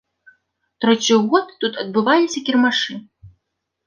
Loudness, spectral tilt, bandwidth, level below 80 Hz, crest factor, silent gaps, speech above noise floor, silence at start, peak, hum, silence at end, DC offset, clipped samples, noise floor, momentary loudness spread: -18 LUFS; -3.5 dB/octave; 10 kHz; -62 dBFS; 18 dB; none; 59 dB; 0.8 s; -2 dBFS; none; 0.6 s; under 0.1%; under 0.1%; -76 dBFS; 9 LU